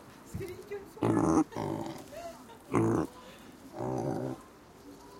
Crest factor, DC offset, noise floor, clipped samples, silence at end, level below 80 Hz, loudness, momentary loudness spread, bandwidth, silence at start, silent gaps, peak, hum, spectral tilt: 22 dB; under 0.1%; -53 dBFS; under 0.1%; 0 s; -58 dBFS; -33 LUFS; 22 LU; 16.5 kHz; 0 s; none; -14 dBFS; none; -7 dB/octave